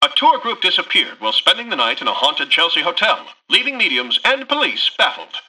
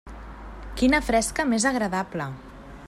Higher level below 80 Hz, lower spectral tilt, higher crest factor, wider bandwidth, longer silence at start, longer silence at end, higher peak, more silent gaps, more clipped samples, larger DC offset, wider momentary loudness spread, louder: second, -66 dBFS vs -40 dBFS; second, -1 dB/octave vs -4 dB/octave; about the same, 16 dB vs 16 dB; second, 12.5 kHz vs 14.5 kHz; about the same, 0 s vs 0.05 s; about the same, 0.1 s vs 0 s; first, -2 dBFS vs -8 dBFS; neither; neither; neither; second, 4 LU vs 20 LU; first, -15 LUFS vs -24 LUFS